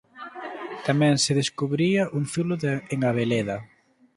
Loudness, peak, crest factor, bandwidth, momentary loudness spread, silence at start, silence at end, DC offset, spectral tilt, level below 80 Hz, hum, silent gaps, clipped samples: -24 LUFS; -6 dBFS; 18 dB; 11.5 kHz; 15 LU; 0.15 s; 0.5 s; under 0.1%; -5 dB/octave; -62 dBFS; none; none; under 0.1%